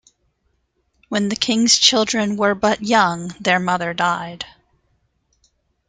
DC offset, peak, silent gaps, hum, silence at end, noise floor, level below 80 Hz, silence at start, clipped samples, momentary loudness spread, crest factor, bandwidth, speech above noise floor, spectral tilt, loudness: under 0.1%; 0 dBFS; none; none; 1.4 s; -67 dBFS; -56 dBFS; 1.1 s; under 0.1%; 13 LU; 20 dB; 9.6 kHz; 49 dB; -2.5 dB/octave; -17 LUFS